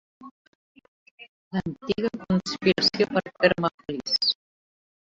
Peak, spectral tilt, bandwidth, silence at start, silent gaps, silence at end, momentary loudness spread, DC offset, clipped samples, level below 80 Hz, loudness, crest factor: -4 dBFS; -5 dB/octave; 8 kHz; 0.2 s; 0.31-0.75 s, 0.88-1.18 s, 1.29-1.51 s, 3.74-3.78 s; 0.8 s; 10 LU; under 0.1%; under 0.1%; -58 dBFS; -25 LUFS; 24 dB